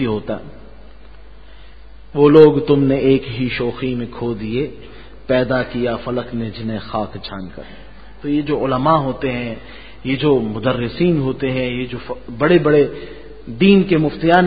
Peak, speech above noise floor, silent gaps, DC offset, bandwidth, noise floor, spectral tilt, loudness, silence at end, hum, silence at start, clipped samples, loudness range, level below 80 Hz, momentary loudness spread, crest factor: 0 dBFS; 25 dB; none; 1%; 5 kHz; -41 dBFS; -10 dB/octave; -17 LUFS; 0 s; none; 0 s; under 0.1%; 7 LU; -42 dBFS; 17 LU; 18 dB